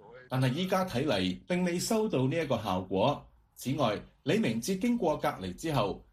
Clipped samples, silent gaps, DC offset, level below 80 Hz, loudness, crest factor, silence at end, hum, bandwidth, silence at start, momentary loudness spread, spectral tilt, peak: under 0.1%; none; under 0.1%; -58 dBFS; -31 LUFS; 16 dB; 0.1 s; none; 15 kHz; 0.05 s; 6 LU; -5.5 dB/octave; -14 dBFS